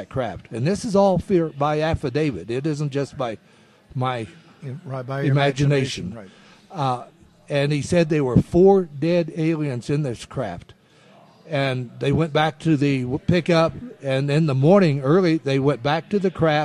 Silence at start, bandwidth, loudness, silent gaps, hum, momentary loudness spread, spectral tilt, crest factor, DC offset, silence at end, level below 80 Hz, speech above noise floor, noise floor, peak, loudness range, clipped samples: 0 s; 11 kHz; -21 LUFS; none; none; 13 LU; -7 dB/octave; 18 dB; under 0.1%; 0 s; -46 dBFS; 31 dB; -52 dBFS; -4 dBFS; 6 LU; under 0.1%